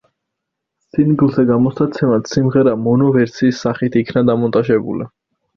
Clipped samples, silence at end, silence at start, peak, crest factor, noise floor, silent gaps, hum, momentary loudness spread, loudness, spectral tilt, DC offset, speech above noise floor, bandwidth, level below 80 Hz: under 0.1%; 0.5 s; 0.95 s; -2 dBFS; 14 dB; -78 dBFS; none; none; 5 LU; -15 LUFS; -8 dB/octave; under 0.1%; 64 dB; 6.8 kHz; -50 dBFS